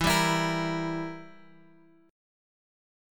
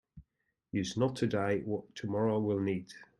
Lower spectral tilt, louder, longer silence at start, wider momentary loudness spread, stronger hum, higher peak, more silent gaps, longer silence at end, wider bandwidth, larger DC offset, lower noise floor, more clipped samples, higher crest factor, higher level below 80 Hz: second, -4 dB/octave vs -6.5 dB/octave; first, -28 LUFS vs -34 LUFS; second, 0 s vs 0.15 s; first, 15 LU vs 8 LU; neither; first, -12 dBFS vs -18 dBFS; neither; first, 1 s vs 0.15 s; first, 17.5 kHz vs 12 kHz; neither; second, -59 dBFS vs -83 dBFS; neither; about the same, 20 dB vs 16 dB; first, -52 dBFS vs -68 dBFS